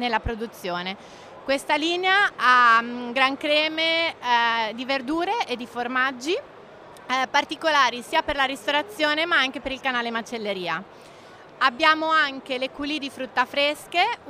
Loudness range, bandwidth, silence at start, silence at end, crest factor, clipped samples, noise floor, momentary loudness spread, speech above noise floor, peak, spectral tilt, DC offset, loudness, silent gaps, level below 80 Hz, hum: 5 LU; 15.5 kHz; 0 s; 0 s; 20 dB; under 0.1%; -46 dBFS; 11 LU; 22 dB; -4 dBFS; -3 dB/octave; under 0.1%; -22 LUFS; none; -52 dBFS; none